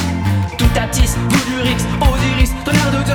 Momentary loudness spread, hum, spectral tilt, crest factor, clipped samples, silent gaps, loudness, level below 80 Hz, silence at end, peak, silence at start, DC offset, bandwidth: 3 LU; none; -5 dB/octave; 14 dB; under 0.1%; none; -15 LUFS; -20 dBFS; 0 s; -2 dBFS; 0 s; under 0.1%; 19.5 kHz